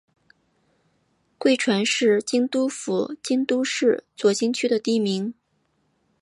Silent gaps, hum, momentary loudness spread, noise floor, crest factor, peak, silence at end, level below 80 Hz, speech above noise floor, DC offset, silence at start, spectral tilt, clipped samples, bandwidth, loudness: none; none; 6 LU; -69 dBFS; 16 dB; -8 dBFS; 0.9 s; -76 dBFS; 47 dB; under 0.1%; 1.4 s; -4 dB/octave; under 0.1%; 11.5 kHz; -22 LUFS